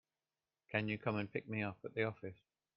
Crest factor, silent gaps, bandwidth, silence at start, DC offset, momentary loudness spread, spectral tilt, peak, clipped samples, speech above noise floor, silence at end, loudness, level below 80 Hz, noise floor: 22 dB; none; 5.6 kHz; 0.7 s; under 0.1%; 5 LU; -5 dB/octave; -20 dBFS; under 0.1%; over 49 dB; 0.45 s; -41 LUFS; -74 dBFS; under -90 dBFS